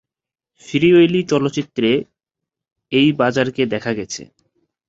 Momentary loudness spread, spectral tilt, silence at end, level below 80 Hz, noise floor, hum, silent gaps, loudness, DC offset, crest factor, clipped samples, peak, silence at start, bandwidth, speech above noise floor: 11 LU; -5.5 dB/octave; 0.65 s; -56 dBFS; -87 dBFS; none; none; -17 LUFS; under 0.1%; 16 dB; under 0.1%; -2 dBFS; 0.65 s; 7.8 kHz; 71 dB